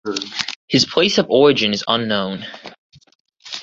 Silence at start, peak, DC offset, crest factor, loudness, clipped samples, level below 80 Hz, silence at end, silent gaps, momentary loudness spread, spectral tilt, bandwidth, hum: 0.05 s; 0 dBFS; under 0.1%; 18 dB; -17 LUFS; under 0.1%; -56 dBFS; 0 s; 0.56-0.68 s, 2.78-2.90 s, 3.15-3.25 s; 17 LU; -4 dB/octave; 7.8 kHz; none